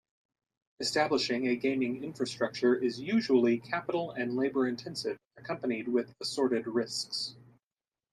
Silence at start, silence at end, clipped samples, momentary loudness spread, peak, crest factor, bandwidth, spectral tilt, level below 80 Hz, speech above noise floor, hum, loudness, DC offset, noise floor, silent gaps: 0.8 s; 0.75 s; under 0.1%; 9 LU; -14 dBFS; 18 dB; 12.5 kHz; -4.5 dB/octave; -76 dBFS; over 59 dB; none; -31 LUFS; under 0.1%; under -90 dBFS; none